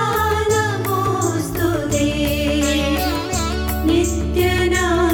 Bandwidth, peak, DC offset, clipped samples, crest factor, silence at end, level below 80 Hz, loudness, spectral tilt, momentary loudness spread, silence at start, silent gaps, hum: 18 kHz; -4 dBFS; under 0.1%; under 0.1%; 14 dB; 0 s; -28 dBFS; -18 LUFS; -5 dB/octave; 4 LU; 0 s; none; none